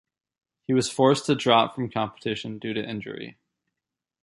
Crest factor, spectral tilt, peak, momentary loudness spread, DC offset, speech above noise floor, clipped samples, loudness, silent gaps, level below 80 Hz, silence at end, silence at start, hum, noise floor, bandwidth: 22 dB; -5 dB/octave; -4 dBFS; 17 LU; under 0.1%; 63 dB; under 0.1%; -24 LUFS; none; -64 dBFS; 0.9 s; 0.7 s; none; -87 dBFS; 11.5 kHz